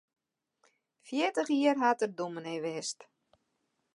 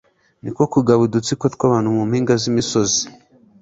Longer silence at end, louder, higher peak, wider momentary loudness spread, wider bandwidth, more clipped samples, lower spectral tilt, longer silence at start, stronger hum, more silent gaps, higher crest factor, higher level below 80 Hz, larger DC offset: first, 0.95 s vs 0.5 s; second, -31 LUFS vs -17 LUFS; second, -12 dBFS vs -2 dBFS; first, 11 LU vs 7 LU; first, 11.5 kHz vs 8 kHz; neither; about the same, -4 dB/octave vs -5 dB/octave; first, 1.05 s vs 0.45 s; neither; neither; about the same, 22 dB vs 18 dB; second, -88 dBFS vs -52 dBFS; neither